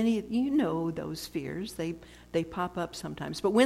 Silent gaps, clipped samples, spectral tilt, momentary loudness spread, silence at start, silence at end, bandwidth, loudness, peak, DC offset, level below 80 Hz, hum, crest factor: none; under 0.1%; -5.5 dB/octave; 9 LU; 0 s; 0 s; 15.5 kHz; -32 LUFS; -10 dBFS; under 0.1%; -58 dBFS; none; 20 dB